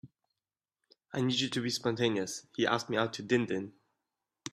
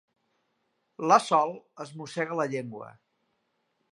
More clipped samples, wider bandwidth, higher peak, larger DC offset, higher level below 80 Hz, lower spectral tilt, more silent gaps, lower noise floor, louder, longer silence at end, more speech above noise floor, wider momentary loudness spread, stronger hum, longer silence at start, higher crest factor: neither; first, 13 kHz vs 11.5 kHz; second, -12 dBFS vs -6 dBFS; neither; first, -72 dBFS vs -84 dBFS; about the same, -4.5 dB/octave vs -4.5 dB/octave; neither; first, under -90 dBFS vs -76 dBFS; second, -32 LUFS vs -27 LUFS; second, 0.05 s vs 1 s; first, over 58 dB vs 49 dB; second, 8 LU vs 21 LU; neither; second, 0.05 s vs 1 s; about the same, 22 dB vs 24 dB